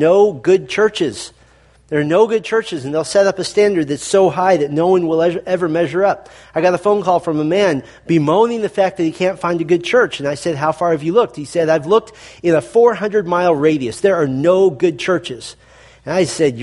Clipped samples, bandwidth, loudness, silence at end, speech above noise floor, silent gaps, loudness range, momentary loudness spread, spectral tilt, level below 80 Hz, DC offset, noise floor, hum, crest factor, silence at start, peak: under 0.1%; 11.5 kHz; -16 LUFS; 0 s; 34 dB; none; 2 LU; 8 LU; -5.5 dB/octave; -54 dBFS; under 0.1%; -49 dBFS; none; 16 dB; 0 s; 0 dBFS